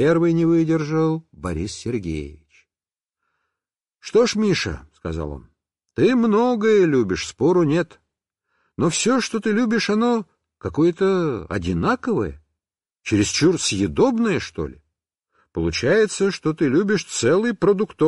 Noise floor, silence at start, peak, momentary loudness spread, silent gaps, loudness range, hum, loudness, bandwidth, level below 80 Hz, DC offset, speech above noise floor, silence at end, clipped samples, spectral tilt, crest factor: under -90 dBFS; 0 s; -6 dBFS; 13 LU; none; 5 LU; none; -20 LUFS; 11.5 kHz; -44 dBFS; under 0.1%; over 71 dB; 0 s; under 0.1%; -5.5 dB/octave; 14 dB